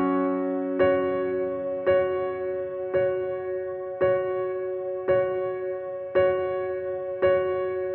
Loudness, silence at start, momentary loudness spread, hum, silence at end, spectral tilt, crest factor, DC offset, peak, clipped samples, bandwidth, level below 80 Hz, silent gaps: -26 LUFS; 0 s; 8 LU; none; 0 s; -10 dB/octave; 16 dB; under 0.1%; -10 dBFS; under 0.1%; 4.2 kHz; -58 dBFS; none